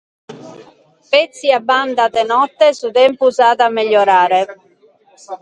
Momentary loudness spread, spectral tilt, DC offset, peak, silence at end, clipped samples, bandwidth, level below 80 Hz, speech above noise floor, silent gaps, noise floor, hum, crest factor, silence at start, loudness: 4 LU; -3 dB/octave; under 0.1%; 0 dBFS; 0.05 s; under 0.1%; 9.4 kHz; -66 dBFS; 38 dB; none; -51 dBFS; none; 14 dB; 0.3 s; -13 LUFS